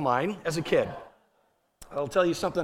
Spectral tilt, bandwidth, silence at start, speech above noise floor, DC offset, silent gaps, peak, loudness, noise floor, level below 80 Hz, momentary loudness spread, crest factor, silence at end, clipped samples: -5.5 dB/octave; 16.5 kHz; 0 s; 43 dB; under 0.1%; none; -10 dBFS; -28 LUFS; -70 dBFS; -58 dBFS; 10 LU; 18 dB; 0 s; under 0.1%